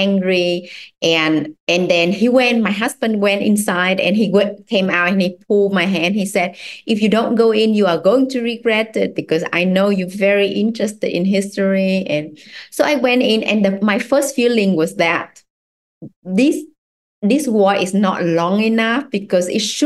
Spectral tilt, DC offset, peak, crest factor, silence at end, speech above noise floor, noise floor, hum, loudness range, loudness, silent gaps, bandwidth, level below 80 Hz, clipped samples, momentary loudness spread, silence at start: -5 dB/octave; under 0.1%; -2 dBFS; 14 dB; 0 s; over 74 dB; under -90 dBFS; none; 2 LU; -16 LUFS; 1.60-1.67 s, 15.50-16.01 s, 16.16-16.22 s, 16.78-17.22 s; 12.5 kHz; -62 dBFS; under 0.1%; 6 LU; 0 s